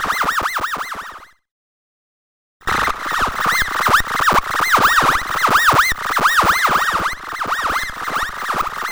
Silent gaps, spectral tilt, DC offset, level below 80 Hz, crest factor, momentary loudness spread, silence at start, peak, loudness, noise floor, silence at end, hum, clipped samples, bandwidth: 1.51-2.60 s; -2 dB/octave; under 0.1%; -38 dBFS; 16 dB; 10 LU; 0 s; -2 dBFS; -16 LUFS; -37 dBFS; 0 s; none; under 0.1%; over 20 kHz